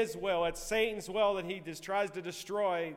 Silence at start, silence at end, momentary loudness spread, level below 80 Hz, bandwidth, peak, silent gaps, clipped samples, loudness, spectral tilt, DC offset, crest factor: 0 s; 0 s; 8 LU; -56 dBFS; 16 kHz; -18 dBFS; none; under 0.1%; -34 LUFS; -3.5 dB/octave; under 0.1%; 16 dB